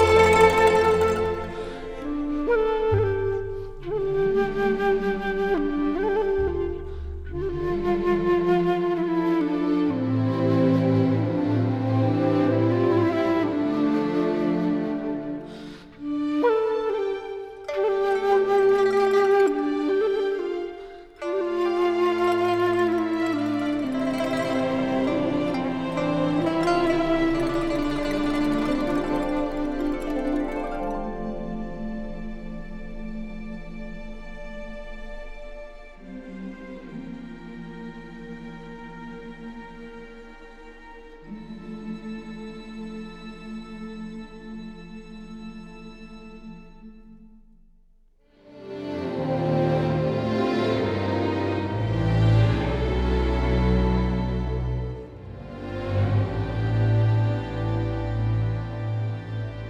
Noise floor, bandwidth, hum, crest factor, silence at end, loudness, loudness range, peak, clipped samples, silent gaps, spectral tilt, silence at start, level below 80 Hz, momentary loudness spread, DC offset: -57 dBFS; 13 kHz; none; 20 dB; 0 s; -24 LUFS; 17 LU; -4 dBFS; under 0.1%; none; -7.5 dB/octave; 0 s; -38 dBFS; 19 LU; under 0.1%